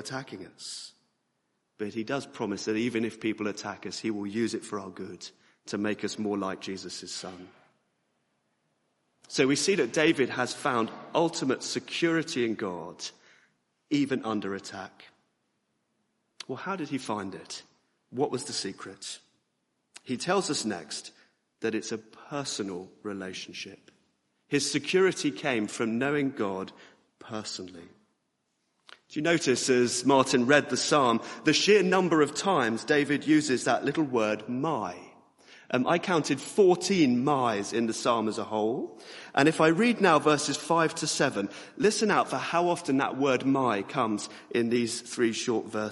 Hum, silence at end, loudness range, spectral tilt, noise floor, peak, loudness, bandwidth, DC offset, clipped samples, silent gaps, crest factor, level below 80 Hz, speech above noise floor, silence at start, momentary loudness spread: none; 0 s; 11 LU; -4 dB/octave; -77 dBFS; -6 dBFS; -28 LUFS; 11.5 kHz; under 0.1%; under 0.1%; none; 22 dB; -72 dBFS; 50 dB; 0 s; 16 LU